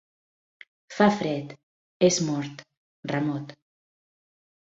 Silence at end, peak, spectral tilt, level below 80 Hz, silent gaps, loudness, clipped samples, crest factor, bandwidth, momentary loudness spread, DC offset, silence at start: 1.15 s; -6 dBFS; -5 dB/octave; -68 dBFS; 1.63-2.00 s, 2.77-3.03 s; -25 LUFS; under 0.1%; 24 dB; 8 kHz; 20 LU; under 0.1%; 0.9 s